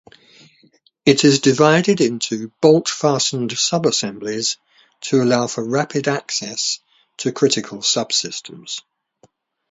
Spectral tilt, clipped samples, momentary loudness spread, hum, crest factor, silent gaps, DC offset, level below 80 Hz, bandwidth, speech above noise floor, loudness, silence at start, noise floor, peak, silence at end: -3.5 dB/octave; under 0.1%; 14 LU; none; 20 dB; none; under 0.1%; -62 dBFS; 8 kHz; 40 dB; -18 LUFS; 1.05 s; -57 dBFS; 0 dBFS; 0.9 s